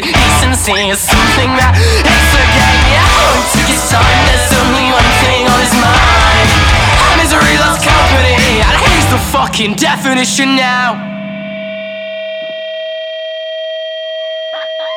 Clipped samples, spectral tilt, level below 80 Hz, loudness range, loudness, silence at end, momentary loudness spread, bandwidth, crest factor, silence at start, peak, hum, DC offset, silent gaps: under 0.1%; -3.5 dB/octave; -18 dBFS; 11 LU; -8 LUFS; 0 s; 13 LU; 19 kHz; 10 dB; 0 s; 0 dBFS; 50 Hz at -30 dBFS; under 0.1%; none